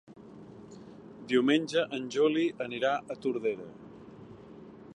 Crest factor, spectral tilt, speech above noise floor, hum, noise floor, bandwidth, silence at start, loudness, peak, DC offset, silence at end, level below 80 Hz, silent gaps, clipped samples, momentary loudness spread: 20 dB; -5 dB/octave; 20 dB; none; -50 dBFS; 11 kHz; 0.1 s; -30 LUFS; -12 dBFS; under 0.1%; 0 s; -72 dBFS; none; under 0.1%; 23 LU